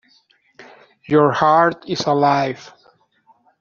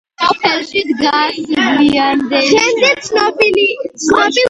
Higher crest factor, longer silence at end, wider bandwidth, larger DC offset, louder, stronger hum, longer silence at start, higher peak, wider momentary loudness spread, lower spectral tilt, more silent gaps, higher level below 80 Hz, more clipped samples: first, 18 dB vs 12 dB; first, 0.95 s vs 0 s; second, 7.4 kHz vs 11 kHz; neither; second, -16 LUFS vs -12 LUFS; neither; first, 0.6 s vs 0.2 s; about the same, -2 dBFS vs 0 dBFS; first, 10 LU vs 5 LU; first, -4.5 dB/octave vs -2.5 dB/octave; neither; second, -62 dBFS vs -50 dBFS; neither